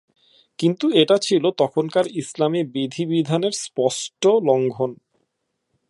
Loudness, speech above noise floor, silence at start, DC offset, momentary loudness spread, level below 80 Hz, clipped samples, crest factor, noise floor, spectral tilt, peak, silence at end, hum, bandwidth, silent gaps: -20 LUFS; 55 dB; 0.6 s; under 0.1%; 8 LU; -72 dBFS; under 0.1%; 20 dB; -75 dBFS; -5 dB/octave; -2 dBFS; 0.95 s; none; 11.5 kHz; none